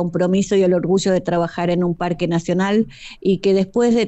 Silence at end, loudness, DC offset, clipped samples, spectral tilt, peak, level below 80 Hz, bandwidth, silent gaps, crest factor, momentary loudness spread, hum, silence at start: 0 s; -18 LUFS; under 0.1%; under 0.1%; -6.5 dB/octave; -6 dBFS; -48 dBFS; 8.4 kHz; none; 12 dB; 5 LU; none; 0 s